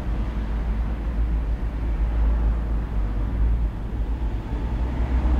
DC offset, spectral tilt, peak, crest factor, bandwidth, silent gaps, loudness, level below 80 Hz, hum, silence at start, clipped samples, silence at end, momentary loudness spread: under 0.1%; -9 dB/octave; -12 dBFS; 12 dB; 4.3 kHz; none; -27 LUFS; -24 dBFS; none; 0 s; under 0.1%; 0 s; 5 LU